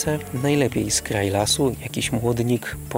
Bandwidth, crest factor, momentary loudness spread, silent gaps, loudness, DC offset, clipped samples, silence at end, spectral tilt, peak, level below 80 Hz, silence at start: 16 kHz; 16 dB; 5 LU; none; -22 LUFS; under 0.1%; under 0.1%; 0 s; -4.5 dB/octave; -6 dBFS; -42 dBFS; 0 s